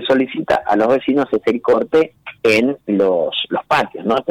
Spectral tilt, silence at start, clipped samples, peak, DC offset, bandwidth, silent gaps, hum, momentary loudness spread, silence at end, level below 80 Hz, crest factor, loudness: -5.5 dB/octave; 0 s; under 0.1%; -6 dBFS; under 0.1%; 15 kHz; none; none; 5 LU; 0 s; -52 dBFS; 10 dB; -17 LUFS